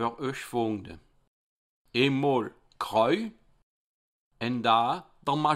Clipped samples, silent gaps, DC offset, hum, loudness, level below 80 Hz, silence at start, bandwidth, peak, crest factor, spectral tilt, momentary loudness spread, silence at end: under 0.1%; 1.27-1.85 s, 3.63-4.31 s; under 0.1%; none; -28 LUFS; -64 dBFS; 0 s; 15.5 kHz; -10 dBFS; 20 dB; -6 dB/octave; 13 LU; 0 s